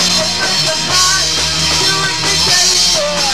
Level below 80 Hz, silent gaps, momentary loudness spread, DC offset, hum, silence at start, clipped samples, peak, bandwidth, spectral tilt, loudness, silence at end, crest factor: -36 dBFS; none; 4 LU; 2%; none; 0 s; under 0.1%; 0 dBFS; 16 kHz; -1 dB/octave; -10 LUFS; 0 s; 12 dB